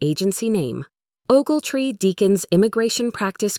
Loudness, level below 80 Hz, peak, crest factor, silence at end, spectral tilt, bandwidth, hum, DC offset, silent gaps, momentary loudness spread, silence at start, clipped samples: -20 LUFS; -58 dBFS; -4 dBFS; 16 dB; 0 s; -5 dB/octave; 18 kHz; none; under 0.1%; none; 6 LU; 0 s; under 0.1%